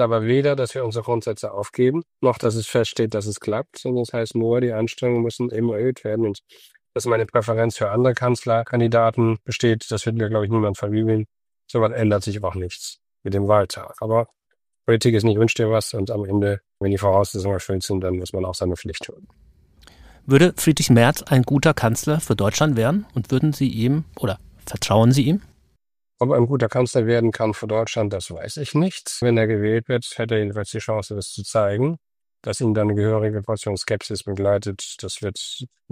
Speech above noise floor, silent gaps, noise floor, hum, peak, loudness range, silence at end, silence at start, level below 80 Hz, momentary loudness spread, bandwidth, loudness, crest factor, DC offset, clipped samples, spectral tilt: 54 dB; none; -74 dBFS; none; -2 dBFS; 4 LU; 0.25 s; 0 s; -50 dBFS; 11 LU; 15.5 kHz; -21 LUFS; 18 dB; under 0.1%; under 0.1%; -6 dB/octave